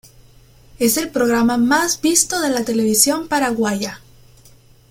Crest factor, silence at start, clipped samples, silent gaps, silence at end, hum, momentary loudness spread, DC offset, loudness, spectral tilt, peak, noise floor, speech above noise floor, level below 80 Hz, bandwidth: 18 dB; 0.8 s; under 0.1%; none; 0.95 s; none; 6 LU; under 0.1%; -17 LUFS; -2.5 dB/octave; 0 dBFS; -48 dBFS; 31 dB; -50 dBFS; 16.5 kHz